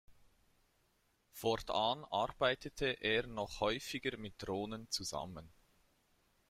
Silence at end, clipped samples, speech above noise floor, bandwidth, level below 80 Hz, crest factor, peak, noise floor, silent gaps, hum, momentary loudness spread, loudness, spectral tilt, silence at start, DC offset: 1 s; under 0.1%; 38 dB; 16 kHz; -62 dBFS; 22 dB; -20 dBFS; -76 dBFS; none; none; 10 LU; -38 LUFS; -3.5 dB/octave; 0.1 s; under 0.1%